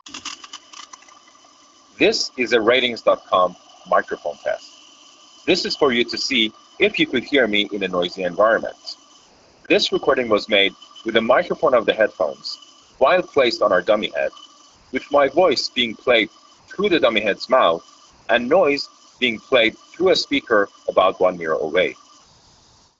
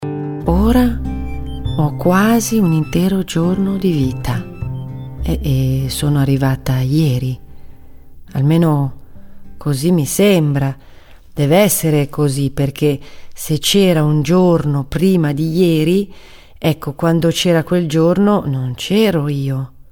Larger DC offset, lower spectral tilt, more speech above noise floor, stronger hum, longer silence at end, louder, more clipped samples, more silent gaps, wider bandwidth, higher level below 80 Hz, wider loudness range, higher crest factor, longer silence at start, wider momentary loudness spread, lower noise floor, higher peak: neither; second, -1 dB/octave vs -6 dB/octave; first, 35 dB vs 24 dB; neither; first, 1.05 s vs 0.15 s; second, -19 LUFS vs -15 LUFS; neither; neither; second, 8 kHz vs 19 kHz; second, -58 dBFS vs -32 dBFS; about the same, 2 LU vs 3 LU; first, 20 dB vs 14 dB; about the same, 0.05 s vs 0 s; about the same, 13 LU vs 12 LU; first, -54 dBFS vs -38 dBFS; about the same, 0 dBFS vs 0 dBFS